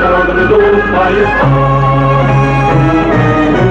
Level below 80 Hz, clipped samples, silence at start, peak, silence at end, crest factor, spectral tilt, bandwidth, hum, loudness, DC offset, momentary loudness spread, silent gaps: -24 dBFS; under 0.1%; 0 s; 0 dBFS; 0 s; 8 dB; -8 dB/octave; 7.4 kHz; none; -9 LUFS; under 0.1%; 1 LU; none